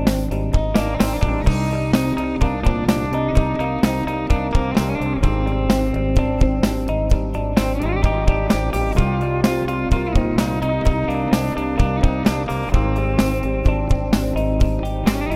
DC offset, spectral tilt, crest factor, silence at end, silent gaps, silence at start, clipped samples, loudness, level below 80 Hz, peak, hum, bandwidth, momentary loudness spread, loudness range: under 0.1%; -7 dB/octave; 14 dB; 0 s; none; 0 s; under 0.1%; -20 LUFS; -22 dBFS; -4 dBFS; none; 15.5 kHz; 2 LU; 0 LU